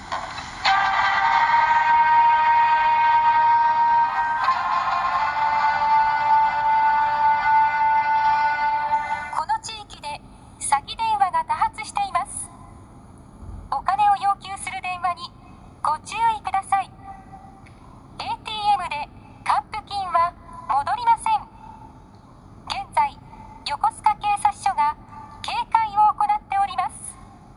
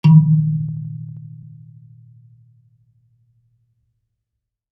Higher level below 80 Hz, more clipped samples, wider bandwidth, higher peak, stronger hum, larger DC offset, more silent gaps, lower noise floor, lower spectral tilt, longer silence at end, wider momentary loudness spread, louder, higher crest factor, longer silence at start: first, -50 dBFS vs -68 dBFS; neither; first, 11.5 kHz vs 4.9 kHz; about the same, -4 dBFS vs -2 dBFS; neither; neither; neither; second, -46 dBFS vs -80 dBFS; second, -2 dB/octave vs -10.5 dB/octave; second, 0.3 s vs 3.35 s; second, 16 LU vs 29 LU; second, -21 LUFS vs -17 LUFS; about the same, 18 dB vs 20 dB; about the same, 0 s vs 0.05 s